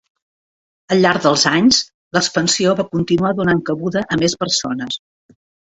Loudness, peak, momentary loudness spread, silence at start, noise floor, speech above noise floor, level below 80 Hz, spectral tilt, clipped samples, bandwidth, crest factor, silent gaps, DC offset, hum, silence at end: -16 LUFS; -2 dBFS; 8 LU; 0.9 s; under -90 dBFS; over 74 dB; -52 dBFS; -4 dB/octave; under 0.1%; 8.2 kHz; 16 dB; 1.94-2.11 s; under 0.1%; none; 0.75 s